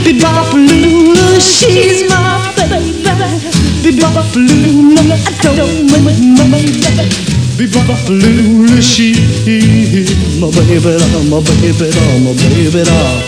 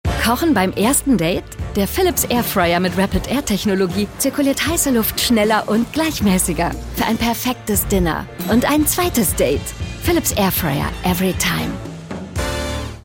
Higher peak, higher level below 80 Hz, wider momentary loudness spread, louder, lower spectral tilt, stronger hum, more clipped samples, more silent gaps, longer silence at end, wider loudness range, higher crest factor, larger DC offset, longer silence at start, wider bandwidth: first, 0 dBFS vs -4 dBFS; first, -26 dBFS vs -32 dBFS; about the same, 6 LU vs 8 LU; first, -8 LUFS vs -18 LUFS; about the same, -5 dB/octave vs -4 dB/octave; neither; first, 1% vs under 0.1%; neither; about the same, 0 s vs 0.05 s; about the same, 1 LU vs 2 LU; second, 8 dB vs 14 dB; first, 0.8% vs under 0.1%; about the same, 0 s vs 0.05 s; second, 11 kHz vs 17 kHz